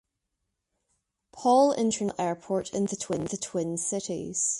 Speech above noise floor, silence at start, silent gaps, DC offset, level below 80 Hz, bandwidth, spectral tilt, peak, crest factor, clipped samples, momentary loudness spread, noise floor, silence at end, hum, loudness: 55 dB; 1.35 s; none; under 0.1%; -64 dBFS; 11.5 kHz; -4.5 dB/octave; -10 dBFS; 18 dB; under 0.1%; 10 LU; -82 dBFS; 0 s; none; -27 LUFS